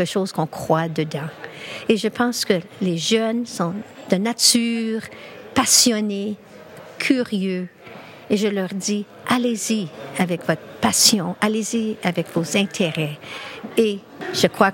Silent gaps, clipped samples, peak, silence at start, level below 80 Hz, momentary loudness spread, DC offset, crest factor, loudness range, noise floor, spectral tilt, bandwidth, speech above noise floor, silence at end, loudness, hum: none; under 0.1%; 0 dBFS; 0 s; -62 dBFS; 17 LU; under 0.1%; 22 dB; 5 LU; -41 dBFS; -3.5 dB/octave; 17 kHz; 20 dB; 0 s; -20 LUFS; none